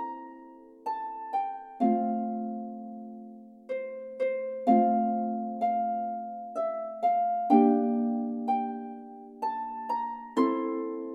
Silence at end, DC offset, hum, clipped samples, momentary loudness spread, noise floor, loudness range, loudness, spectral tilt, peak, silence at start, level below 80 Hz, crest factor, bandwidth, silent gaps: 0 s; under 0.1%; none; under 0.1%; 18 LU; -50 dBFS; 6 LU; -29 LUFS; -8.5 dB/octave; -8 dBFS; 0 s; -78 dBFS; 20 dB; 7.8 kHz; none